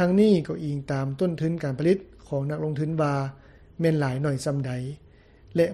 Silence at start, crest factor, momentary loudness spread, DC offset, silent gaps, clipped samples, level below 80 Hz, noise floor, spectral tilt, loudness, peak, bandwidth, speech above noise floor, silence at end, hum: 0 s; 16 dB; 9 LU; under 0.1%; none; under 0.1%; -54 dBFS; -52 dBFS; -7.5 dB/octave; -26 LUFS; -8 dBFS; 12.5 kHz; 28 dB; 0 s; none